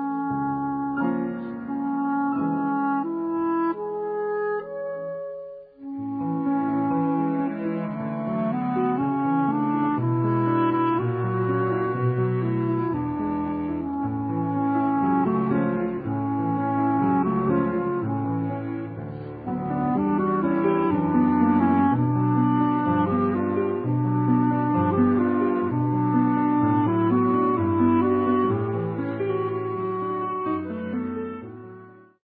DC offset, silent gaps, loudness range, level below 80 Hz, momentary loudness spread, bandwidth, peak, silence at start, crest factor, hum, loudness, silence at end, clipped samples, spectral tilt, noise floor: under 0.1%; none; 6 LU; -52 dBFS; 9 LU; 4.3 kHz; -8 dBFS; 0 s; 14 dB; none; -24 LUFS; 0.45 s; under 0.1%; -13 dB/octave; -46 dBFS